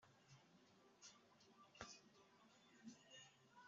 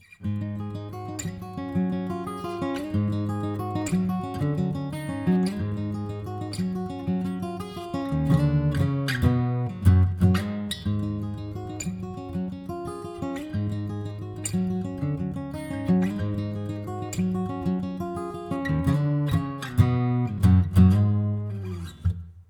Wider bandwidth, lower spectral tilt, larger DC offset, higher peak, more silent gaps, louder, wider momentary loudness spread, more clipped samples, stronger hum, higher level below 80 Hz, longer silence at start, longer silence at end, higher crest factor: second, 7.6 kHz vs 18 kHz; second, -2.5 dB/octave vs -7.5 dB/octave; neither; second, -36 dBFS vs -6 dBFS; neither; second, -63 LUFS vs -27 LUFS; second, 6 LU vs 12 LU; neither; neither; second, -88 dBFS vs -46 dBFS; second, 0 s vs 0.2 s; about the same, 0 s vs 0.05 s; first, 30 dB vs 20 dB